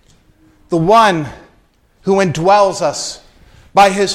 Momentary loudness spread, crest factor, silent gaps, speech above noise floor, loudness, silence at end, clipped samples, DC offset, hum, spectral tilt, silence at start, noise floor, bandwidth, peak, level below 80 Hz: 15 LU; 14 dB; none; 41 dB; -13 LUFS; 0 s; under 0.1%; under 0.1%; none; -4.5 dB/octave; 0.7 s; -53 dBFS; 15.5 kHz; 0 dBFS; -46 dBFS